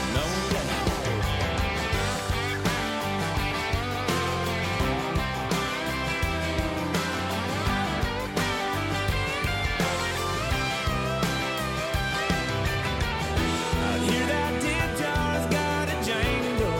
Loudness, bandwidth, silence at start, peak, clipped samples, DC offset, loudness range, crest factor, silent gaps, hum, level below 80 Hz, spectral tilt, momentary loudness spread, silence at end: -27 LUFS; 17 kHz; 0 s; -14 dBFS; under 0.1%; under 0.1%; 1 LU; 12 dB; none; none; -38 dBFS; -4.5 dB/octave; 2 LU; 0 s